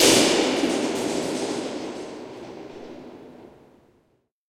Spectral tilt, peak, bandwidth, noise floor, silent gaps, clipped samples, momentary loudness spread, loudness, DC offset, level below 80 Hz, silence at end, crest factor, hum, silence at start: -2.5 dB/octave; -4 dBFS; 16.5 kHz; -67 dBFS; none; under 0.1%; 23 LU; -23 LUFS; under 0.1%; -62 dBFS; 1 s; 22 dB; none; 0 s